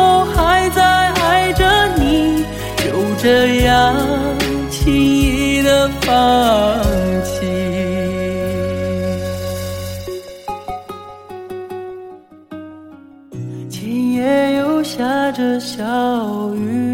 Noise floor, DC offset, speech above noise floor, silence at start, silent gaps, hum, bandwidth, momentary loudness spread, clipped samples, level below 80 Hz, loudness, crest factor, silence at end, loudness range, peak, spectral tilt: -39 dBFS; 0.2%; 27 dB; 0 s; none; none; 17 kHz; 17 LU; under 0.1%; -30 dBFS; -15 LUFS; 14 dB; 0 s; 15 LU; -2 dBFS; -5 dB/octave